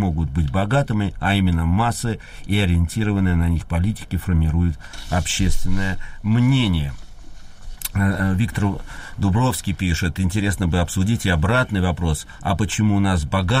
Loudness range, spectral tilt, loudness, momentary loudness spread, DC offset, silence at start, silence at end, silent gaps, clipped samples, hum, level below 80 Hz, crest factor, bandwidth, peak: 2 LU; -5.5 dB/octave; -21 LUFS; 7 LU; under 0.1%; 0 s; 0 s; none; under 0.1%; none; -30 dBFS; 12 dB; 15.5 kHz; -8 dBFS